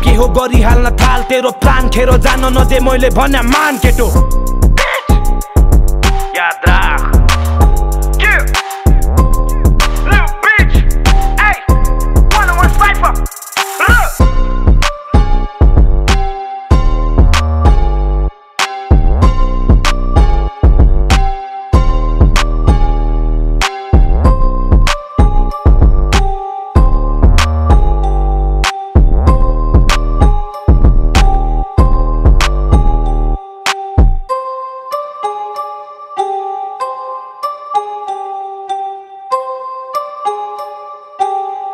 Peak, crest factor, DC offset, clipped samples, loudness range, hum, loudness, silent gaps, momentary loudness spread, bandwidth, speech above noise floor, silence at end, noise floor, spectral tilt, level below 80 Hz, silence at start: 0 dBFS; 10 dB; under 0.1%; under 0.1%; 9 LU; none; -12 LUFS; none; 11 LU; 15.5 kHz; 21 dB; 0 s; -29 dBFS; -5.5 dB/octave; -10 dBFS; 0 s